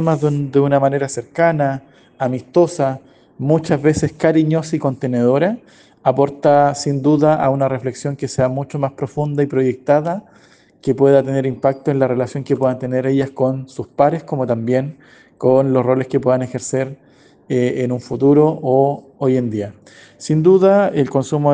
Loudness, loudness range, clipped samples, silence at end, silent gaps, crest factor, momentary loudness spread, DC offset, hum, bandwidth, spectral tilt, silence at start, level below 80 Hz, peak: -17 LUFS; 2 LU; under 0.1%; 0 s; none; 16 dB; 9 LU; under 0.1%; none; 9.6 kHz; -7.5 dB/octave; 0 s; -54 dBFS; 0 dBFS